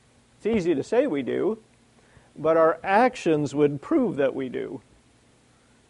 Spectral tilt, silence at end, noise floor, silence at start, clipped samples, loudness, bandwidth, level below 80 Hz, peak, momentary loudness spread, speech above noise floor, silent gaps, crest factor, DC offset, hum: -6.5 dB/octave; 1.1 s; -59 dBFS; 0.45 s; under 0.1%; -24 LUFS; 11 kHz; -60 dBFS; -6 dBFS; 12 LU; 36 dB; none; 18 dB; under 0.1%; none